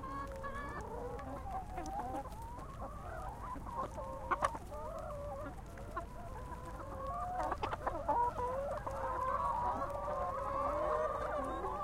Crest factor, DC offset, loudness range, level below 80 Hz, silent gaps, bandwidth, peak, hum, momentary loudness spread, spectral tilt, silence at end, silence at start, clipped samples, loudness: 22 dB; under 0.1%; 7 LU; -50 dBFS; none; 16.5 kHz; -16 dBFS; none; 11 LU; -6 dB/octave; 0 s; 0 s; under 0.1%; -40 LUFS